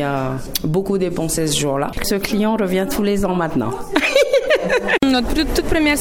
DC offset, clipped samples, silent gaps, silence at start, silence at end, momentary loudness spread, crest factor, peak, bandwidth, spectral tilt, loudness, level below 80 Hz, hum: under 0.1%; under 0.1%; none; 0 s; 0 s; 6 LU; 16 dB; 0 dBFS; 18 kHz; -4.5 dB/octave; -18 LUFS; -32 dBFS; none